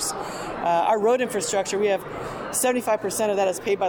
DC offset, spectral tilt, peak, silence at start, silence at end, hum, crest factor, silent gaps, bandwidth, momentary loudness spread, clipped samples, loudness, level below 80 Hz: under 0.1%; -3 dB/octave; -12 dBFS; 0 s; 0 s; none; 12 dB; none; over 20 kHz; 9 LU; under 0.1%; -24 LUFS; -54 dBFS